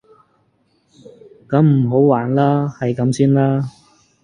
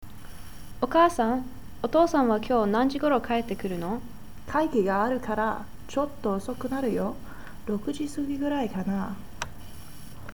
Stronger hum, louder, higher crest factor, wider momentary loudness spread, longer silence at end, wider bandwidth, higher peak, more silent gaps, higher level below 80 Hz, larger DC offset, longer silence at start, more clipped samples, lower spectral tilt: neither; first, -16 LUFS vs -27 LUFS; about the same, 16 dB vs 18 dB; second, 7 LU vs 23 LU; first, 0.55 s vs 0 s; second, 10.5 kHz vs over 20 kHz; first, 0 dBFS vs -10 dBFS; neither; second, -56 dBFS vs -48 dBFS; second, under 0.1% vs 1%; first, 1.5 s vs 0 s; neither; first, -8.5 dB/octave vs -6 dB/octave